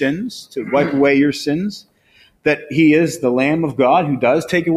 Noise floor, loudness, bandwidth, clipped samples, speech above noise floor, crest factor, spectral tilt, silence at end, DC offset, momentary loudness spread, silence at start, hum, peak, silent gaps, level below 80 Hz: -53 dBFS; -16 LUFS; 14 kHz; under 0.1%; 37 dB; 14 dB; -6 dB/octave; 0 s; under 0.1%; 12 LU; 0 s; none; -2 dBFS; none; -54 dBFS